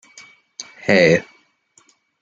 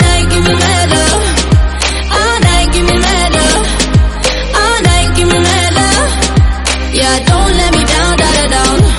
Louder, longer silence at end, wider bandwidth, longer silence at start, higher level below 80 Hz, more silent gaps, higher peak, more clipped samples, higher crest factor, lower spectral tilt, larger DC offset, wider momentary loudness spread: second, -16 LUFS vs -9 LUFS; first, 1 s vs 0 s; second, 7.8 kHz vs 12 kHz; first, 0.6 s vs 0 s; second, -62 dBFS vs -14 dBFS; neither; about the same, -2 dBFS vs 0 dBFS; second, under 0.1% vs 0.1%; first, 20 dB vs 10 dB; about the same, -5 dB/octave vs -4 dB/octave; neither; first, 23 LU vs 3 LU